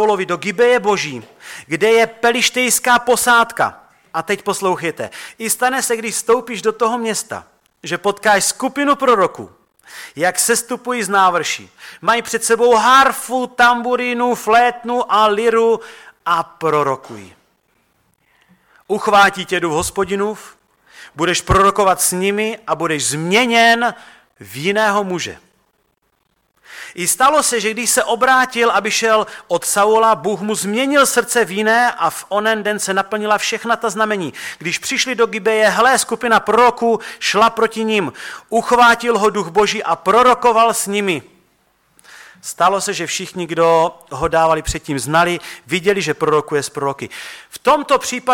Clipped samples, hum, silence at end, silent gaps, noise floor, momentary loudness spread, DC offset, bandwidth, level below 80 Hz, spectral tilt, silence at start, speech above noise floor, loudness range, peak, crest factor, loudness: under 0.1%; none; 0 s; none; -65 dBFS; 11 LU; under 0.1%; 17.5 kHz; -46 dBFS; -2.5 dB/octave; 0 s; 49 dB; 5 LU; -2 dBFS; 14 dB; -15 LUFS